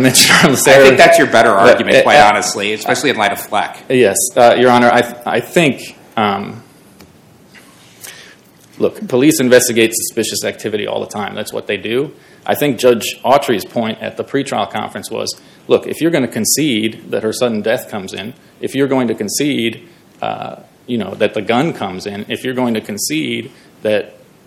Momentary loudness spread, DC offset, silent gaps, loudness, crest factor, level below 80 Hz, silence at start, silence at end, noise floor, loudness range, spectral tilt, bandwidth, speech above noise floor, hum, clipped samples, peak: 16 LU; under 0.1%; none; -13 LUFS; 14 dB; -52 dBFS; 0 s; 0.35 s; -44 dBFS; 9 LU; -3.5 dB/octave; over 20 kHz; 31 dB; none; 0.7%; 0 dBFS